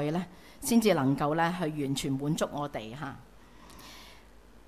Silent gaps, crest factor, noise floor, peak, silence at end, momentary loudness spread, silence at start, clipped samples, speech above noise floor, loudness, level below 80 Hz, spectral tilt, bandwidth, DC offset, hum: none; 18 dB; -55 dBFS; -12 dBFS; 0.55 s; 22 LU; 0 s; under 0.1%; 26 dB; -30 LUFS; -58 dBFS; -5.5 dB/octave; 16 kHz; 0.1%; none